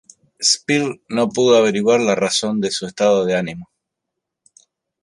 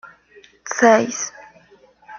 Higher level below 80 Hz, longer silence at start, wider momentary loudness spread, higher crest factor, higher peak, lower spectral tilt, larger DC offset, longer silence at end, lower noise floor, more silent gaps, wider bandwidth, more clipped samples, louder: first, -60 dBFS vs -68 dBFS; first, 0.4 s vs 0.05 s; second, 9 LU vs 16 LU; about the same, 16 dB vs 20 dB; about the same, -2 dBFS vs -2 dBFS; about the same, -3.5 dB/octave vs -3 dB/octave; neither; first, 1.4 s vs 0 s; first, -80 dBFS vs -52 dBFS; neither; first, 11.5 kHz vs 7.2 kHz; neither; about the same, -17 LUFS vs -18 LUFS